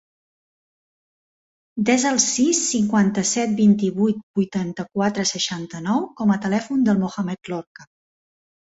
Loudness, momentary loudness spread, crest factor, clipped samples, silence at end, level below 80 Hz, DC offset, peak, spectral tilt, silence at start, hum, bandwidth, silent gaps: -20 LUFS; 10 LU; 18 dB; under 0.1%; 0.9 s; -62 dBFS; under 0.1%; -4 dBFS; -4 dB/octave; 1.75 s; none; 8 kHz; 4.23-4.34 s, 7.67-7.75 s